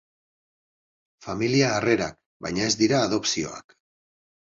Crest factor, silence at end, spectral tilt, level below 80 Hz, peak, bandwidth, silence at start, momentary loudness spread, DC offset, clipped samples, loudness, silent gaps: 20 dB; 0.9 s; -4 dB/octave; -56 dBFS; -8 dBFS; 7.8 kHz; 1.2 s; 14 LU; under 0.1%; under 0.1%; -24 LUFS; 2.26-2.40 s